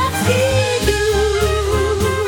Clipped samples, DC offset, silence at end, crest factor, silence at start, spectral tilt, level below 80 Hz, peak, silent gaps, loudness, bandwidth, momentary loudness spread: under 0.1%; under 0.1%; 0 s; 14 dB; 0 s; -4.5 dB/octave; -26 dBFS; -2 dBFS; none; -16 LUFS; 19 kHz; 2 LU